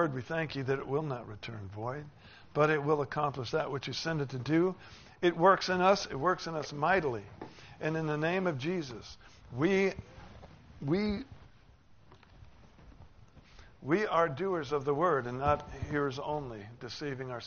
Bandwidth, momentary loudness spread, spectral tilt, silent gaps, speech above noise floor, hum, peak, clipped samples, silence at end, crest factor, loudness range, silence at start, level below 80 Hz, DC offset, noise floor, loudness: 6.8 kHz; 18 LU; -4.5 dB/octave; none; 27 dB; none; -10 dBFS; under 0.1%; 0 s; 22 dB; 8 LU; 0 s; -58 dBFS; under 0.1%; -59 dBFS; -32 LUFS